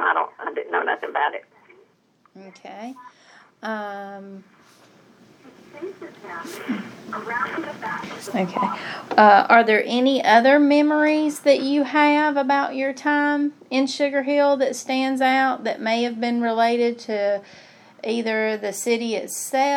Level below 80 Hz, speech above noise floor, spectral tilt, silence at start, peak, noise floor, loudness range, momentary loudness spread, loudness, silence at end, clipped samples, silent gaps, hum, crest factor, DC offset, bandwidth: -78 dBFS; 40 dB; -4 dB/octave; 0 s; 0 dBFS; -61 dBFS; 20 LU; 19 LU; -20 LUFS; 0 s; under 0.1%; none; none; 22 dB; under 0.1%; 17 kHz